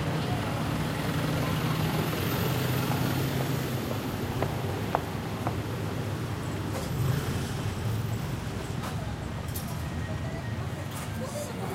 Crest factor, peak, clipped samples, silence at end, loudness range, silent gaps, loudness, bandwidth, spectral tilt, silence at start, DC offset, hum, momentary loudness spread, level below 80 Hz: 22 dB; -8 dBFS; under 0.1%; 0 s; 5 LU; none; -31 LUFS; 16 kHz; -5.5 dB/octave; 0 s; under 0.1%; none; 6 LU; -46 dBFS